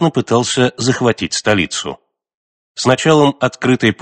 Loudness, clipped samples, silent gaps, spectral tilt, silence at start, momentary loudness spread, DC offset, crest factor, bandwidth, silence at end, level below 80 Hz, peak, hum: -14 LUFS; under 0.1%; 2.34-2.75 s; -4.5 dB/octave; 0 s; 8 LU; under 0.1%; 16 dB; 9 kHz; 0.1 s; -50 dBFS; 0 dBFS; none